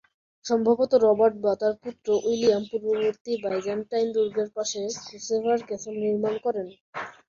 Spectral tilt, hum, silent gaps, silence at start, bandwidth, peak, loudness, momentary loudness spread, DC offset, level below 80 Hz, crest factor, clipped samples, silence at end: -4.5 dB/octave; none; 3.21-3.25 s, 6.81-6.93 s; 0.45 s; 7.4 kHz; -8 dBFS; -25 LUFS; 13 LU; under 0.1%; -68 dBFS; 16 dB; under 0.1%; 0.15 s